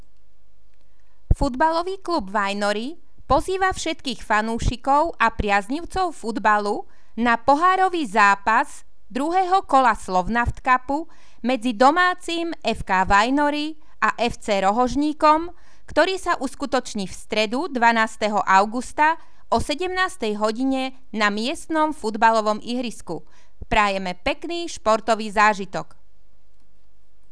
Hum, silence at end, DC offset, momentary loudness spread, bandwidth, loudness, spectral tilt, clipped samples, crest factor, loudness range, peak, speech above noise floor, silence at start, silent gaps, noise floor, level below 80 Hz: none; 1.5 s; 2%; 11 LU; 11 kHz; -21 LUFS; -4.5 dB/octave; under 0.1%; 20 dB; 3 LU; -2 dBFS; 40 dB; 1.3 s; none; -61 dBFS; -38 dBFS